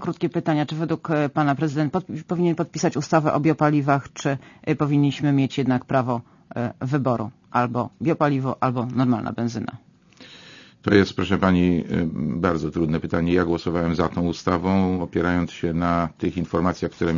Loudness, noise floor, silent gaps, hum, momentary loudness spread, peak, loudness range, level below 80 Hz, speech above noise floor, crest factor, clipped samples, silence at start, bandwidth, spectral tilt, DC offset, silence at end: -23 LUFS; -48 dBFS; none; none; 8 LU; -2 dBFS; 2 LU; -48 dBFS; 26 dB; 20 dB; under 0.1%; 0 s; 7.4 kHz; -7 dB/octave; under 0.1%; 0 s